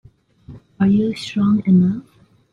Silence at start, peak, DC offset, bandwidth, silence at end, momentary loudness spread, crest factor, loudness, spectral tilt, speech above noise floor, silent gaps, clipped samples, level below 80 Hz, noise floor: 0.5 s; -6 dBFS; under 0.1%; 10 kHz; 0.5 s; 7 LU; 14 dB; -17 LUFS; -8 dB/octave; 27 dB; none; under 0.1%; -52 dBFS; -43 dBFS